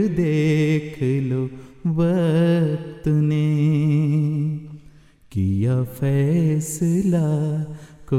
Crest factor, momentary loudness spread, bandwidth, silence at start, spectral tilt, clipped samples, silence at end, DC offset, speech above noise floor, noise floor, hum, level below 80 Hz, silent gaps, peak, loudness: 12 dB; 9 LU; 14 kHz; 0 s; -8 dB/octave; under 0.1%; 0 s; under 0.1%; 29 dB; -48 dBFS; none; -50 dBFS; none; -8 dBFS; -21 LUFS